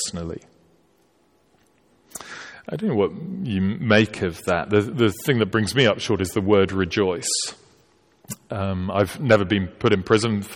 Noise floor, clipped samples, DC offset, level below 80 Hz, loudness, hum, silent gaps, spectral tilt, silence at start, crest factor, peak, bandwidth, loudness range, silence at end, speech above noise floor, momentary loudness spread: -62 dBFS; under 0.1%; under 0.1%; -52 dBFS; -21 LUFS; none; none; -5 dB/octave; 0 s; 18 dB; -4 dBFS; 17.5 kHz; 8 LU; 0 s; 40 dB; 17 LU